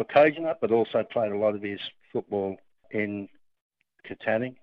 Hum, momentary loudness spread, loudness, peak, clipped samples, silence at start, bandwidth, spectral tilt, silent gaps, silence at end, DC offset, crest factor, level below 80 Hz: none; 15 LU; -27 LUFS; -8 dBFS; under 0.1%; 0 s; 5.4 kHz; -8.5 dB/octave; 3.61-3.70 s; 0.1 s; under 0.1%; 20 dB; -74 dBFS